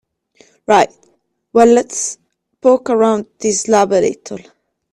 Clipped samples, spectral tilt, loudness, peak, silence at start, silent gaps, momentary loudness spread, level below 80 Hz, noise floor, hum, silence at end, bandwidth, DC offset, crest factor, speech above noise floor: under 0.1%; -4 dB/octave; -14 LUFS; 0 dBFS; 0.7 s; none; 19 LU; -56 dBFS; -52 dBFS; none; 0.55 s; 12 kHz; under 0.1%; 16 dB; 38 dB